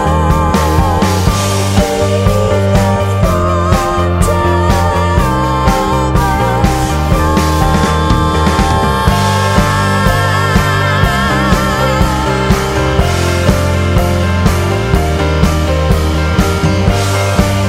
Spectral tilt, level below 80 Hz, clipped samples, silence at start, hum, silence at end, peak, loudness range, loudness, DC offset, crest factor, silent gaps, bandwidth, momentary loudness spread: -5.5 dB/octave; -18 dBFS; under 0.1%; 0 s; none; 0 s; 0 dBFS; 1 LU; -12 LUFS; under 0.1%; 10 dB; none; 16.5 kHz; 2 LU